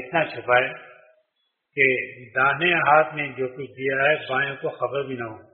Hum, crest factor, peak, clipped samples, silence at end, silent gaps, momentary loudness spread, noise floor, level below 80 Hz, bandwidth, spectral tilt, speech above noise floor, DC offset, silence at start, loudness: none; 20 dB; -4 dBFS; under 0.1%; 0.1 s; none; 12 LU; -75 dBFS; -66 dBFS; 4.2 kHz; -2 dB/octave; 52 dB; under 0.1%; 0 s; -22 LUFS